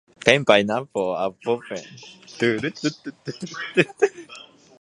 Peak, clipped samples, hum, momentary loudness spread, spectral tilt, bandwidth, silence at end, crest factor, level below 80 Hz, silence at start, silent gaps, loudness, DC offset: 0 dBFS; under 0.1%; none; 23 LU; -4.5 dB/octave; 11.5 kHz; 0.4 s; 24 dB; -64 dBFS; 0.25 s; none; -22 LUFS; under 0.1%